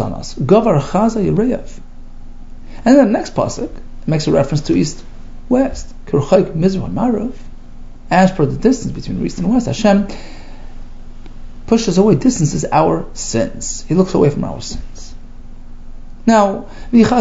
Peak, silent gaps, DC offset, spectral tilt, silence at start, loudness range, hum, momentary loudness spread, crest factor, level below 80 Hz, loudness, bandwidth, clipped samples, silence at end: 0 dBFS; none; under 0.1%; -6.5 dB/octave; 0 s; 3 LU; none; 14 LU; 16 dB; -30 dBFS; -15 LUFS; 8 kHz; under 0.1%; 0 s